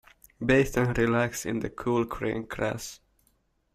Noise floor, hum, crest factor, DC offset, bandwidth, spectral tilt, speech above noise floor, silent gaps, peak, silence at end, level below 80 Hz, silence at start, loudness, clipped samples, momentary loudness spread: -70 dBFS; none; 20 dB; under 0.1%; 16 kHz; -6 dB/octave; 43 dB; none; -8 dBFS; 0.8 s; -48 dBFS; 0.4 s; -27 LUFS; under 0.1%; 9 LU